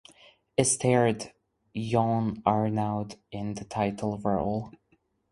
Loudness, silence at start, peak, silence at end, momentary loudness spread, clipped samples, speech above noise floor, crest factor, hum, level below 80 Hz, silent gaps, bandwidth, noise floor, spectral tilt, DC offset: -28 LUFS; 0.6 s; -6 dBFS; 0.6 s; 13 LU; under 0.1%; 42 dB; 22 dB; none; -56 dBFS; none; 11.5 kHz; -70 dBFS; -5.5 dB/octave; under 0.1%